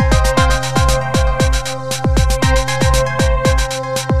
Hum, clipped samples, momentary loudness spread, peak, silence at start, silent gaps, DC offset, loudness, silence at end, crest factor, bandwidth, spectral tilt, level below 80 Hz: none; under 0.1%; 5 LU; 0 dBFS; 0 s; none; 4%; -15 LUFS; 0 s; 14 dB; 14.5 kHz; -4.5 dB/octave; -18 dBFS